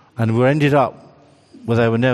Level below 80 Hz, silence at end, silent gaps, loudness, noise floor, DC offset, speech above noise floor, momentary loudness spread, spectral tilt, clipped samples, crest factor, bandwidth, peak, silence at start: -54 dBFS; 0 s; none; -17 LUFS; -47 dBFS; under 0.1%; 32 dB; 7 LU; -8 dB/octave; under 0.1%; 14 dB; 11.5 kHz; -2 dBFS; 0.2 s